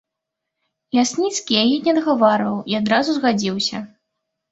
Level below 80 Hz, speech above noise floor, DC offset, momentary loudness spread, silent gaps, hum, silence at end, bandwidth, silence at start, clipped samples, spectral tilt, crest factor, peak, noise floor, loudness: -62 dBFS; 63 dB; under 0.1%; 6 LU; none; none; 0.65 s; 8 kHz; 0.95 s; under 0.1%; -4 dB/octave; 20 dB; 0 dBFS; -81 dBFS; -18 LUFS